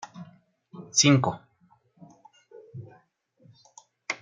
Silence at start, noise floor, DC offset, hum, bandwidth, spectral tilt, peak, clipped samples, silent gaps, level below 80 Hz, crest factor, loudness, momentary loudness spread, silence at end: 0.15 s; -64 dBFS; under 0.1%; none; 9.6 kHz; -3.5 dB/octave; -6 dBFS; under 0.1%; none; -70 dBFS; 24 dB; -22 LUFS; 27 LU; 0.05 s